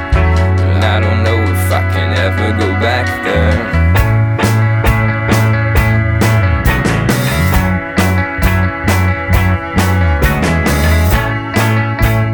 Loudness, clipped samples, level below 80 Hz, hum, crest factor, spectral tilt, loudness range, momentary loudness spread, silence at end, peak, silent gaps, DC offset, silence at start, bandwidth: -12 LUFS; under 0.1%; -20 dBFS; none; 12 dB; -6 dB/octave; 1 LU; 2 LU; 0 s; 0 dBFS; none; under 0.1%; 0 s; over 20 kHz